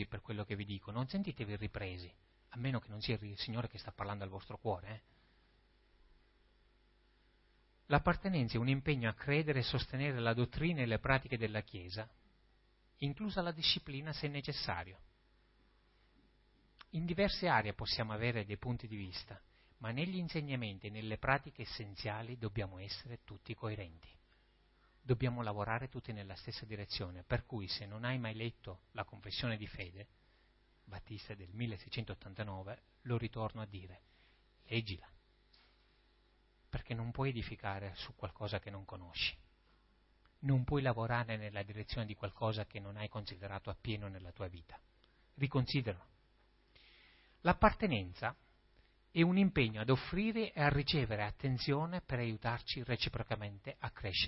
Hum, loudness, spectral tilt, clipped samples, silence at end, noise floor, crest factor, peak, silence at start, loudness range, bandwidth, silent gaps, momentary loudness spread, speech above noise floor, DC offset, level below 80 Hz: none; -39 LUFS; -4.5 dB/octave; under 0.1%; 0 s; -71 dBFS; 28 dB; -12 dBFS; 0 s; 10 LU; 5.8 kHz; none; 15 LU; 32 dB; under 0.1%; -56 dBFS